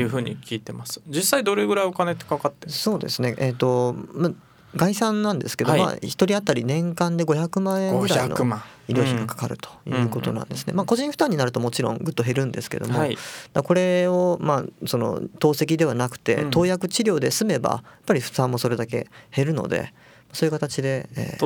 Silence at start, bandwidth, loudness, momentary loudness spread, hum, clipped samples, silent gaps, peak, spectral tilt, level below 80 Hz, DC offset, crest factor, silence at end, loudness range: 0 s; over 20 kHz; -23 LUFS; 8 LU; none; under 0.1%; none; -4 dBFS; -5.5 dB/octave; -60 dBFS; under 0.1%; 20 dB; 0 s; 3 LU